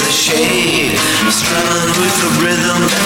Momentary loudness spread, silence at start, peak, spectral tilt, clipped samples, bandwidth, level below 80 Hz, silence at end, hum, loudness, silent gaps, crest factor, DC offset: 1 LU; 0 s; 0 dBFS; -2.5 dB/octave; under 0.1%; 17.5 kHz; -42 dBFS; 0 s; none; -12 LUFS; none; 12 dB; 0.1%